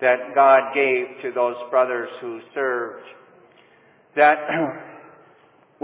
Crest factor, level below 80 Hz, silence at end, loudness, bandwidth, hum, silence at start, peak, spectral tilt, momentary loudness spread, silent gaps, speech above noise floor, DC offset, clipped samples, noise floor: 20 dB; -84 dBFS; 0.85 s; -20 LUFS; 4 kHz; none; 0 s; -2 dBFS; -8 dB/octave; 17 LU; none; 35 dB; under 0.1%; under 0.1%; -55 dBFS